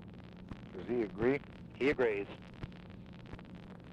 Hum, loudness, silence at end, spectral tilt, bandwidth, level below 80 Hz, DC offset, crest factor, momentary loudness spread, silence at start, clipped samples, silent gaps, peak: none; -35 LUFS; 0 s; -7.5 dB/octave; 9 kHz; -58 dBFS; under 0.1%; 18 dB; 19 LU; 0 s; under 0.1%; none; -20 dBFS